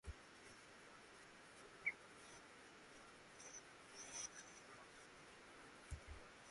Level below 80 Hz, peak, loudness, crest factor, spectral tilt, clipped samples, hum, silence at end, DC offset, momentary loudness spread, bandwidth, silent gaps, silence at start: -68 dBFS; -32 dBFS; -56 LUFS; 26 dB; -2 dB/octave; under 0.1%; none; 0 s; under 0.1%; 14 LU; 11.5 kHz; none; 0.05 s